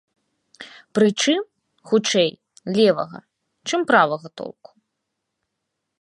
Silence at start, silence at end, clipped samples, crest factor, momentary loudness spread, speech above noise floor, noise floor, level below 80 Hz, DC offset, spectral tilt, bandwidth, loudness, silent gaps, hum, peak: 0.6 s; 1.5 s; under 0.1%; 20 dB; 20 LU; 59 dB; -79 dBFS; -72 dBFS; under 0.1%; -4 dB/octave; 11.5 kHz; -20 LUFS; none; none; -2 dBFS